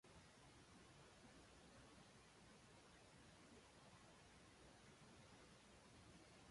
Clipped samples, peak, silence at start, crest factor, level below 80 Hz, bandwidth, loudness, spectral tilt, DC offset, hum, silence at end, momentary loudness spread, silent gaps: under 0.1%; -54 dBFS; 0.05 s; 14 dB; -78 dBFS; 11.5 kHz; -67 LUFS; -4 dB/octave; under 0.1%; none; 0 s; 1 LU; none